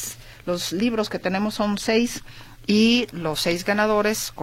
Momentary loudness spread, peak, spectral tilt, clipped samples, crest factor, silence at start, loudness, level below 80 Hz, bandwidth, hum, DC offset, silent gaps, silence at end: 11 LU; -8 dBFS; -4 dB/octave; under 0.1%; 14 dB; 0 s; -22 LUFS; -48 dBFS; 16.5 kHz; none; under 0.1%; none; 0 s